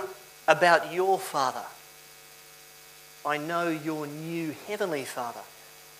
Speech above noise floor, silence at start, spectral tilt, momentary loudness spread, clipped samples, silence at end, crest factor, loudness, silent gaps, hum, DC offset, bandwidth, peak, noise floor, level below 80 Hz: 23 dB; 0 s; -4 dB/octave; 26 LU; under 0.1%; 0 s; 24 dB; -28 LUFS; none; none; under 0.1%; 15.5 kHz; -6 dBFS; -51 dBFS; -76 dBFS